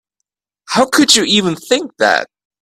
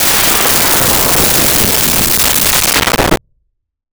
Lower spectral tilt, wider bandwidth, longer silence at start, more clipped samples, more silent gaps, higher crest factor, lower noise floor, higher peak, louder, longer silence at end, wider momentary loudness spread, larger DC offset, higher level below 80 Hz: about the same, -2.5 dB/octave vs -1.5 dB/octave; second, 16 kHz vs over 20 kHz; first, 0.7 s vs 0 s; neither; neither; about the same, 16 dB vs 12 dB; first, -77 dBFS vs -65 dBFS; about the same, 0 dBFS vs 0 dBFS; second, -12 LUFS vs -8 LUFS; second, 0.4 s vs 0.75 s; first, 9 LU vs 3 LU; second, under 0.1% vs 0.9%; second, -56 dBFS vs -28 dBFS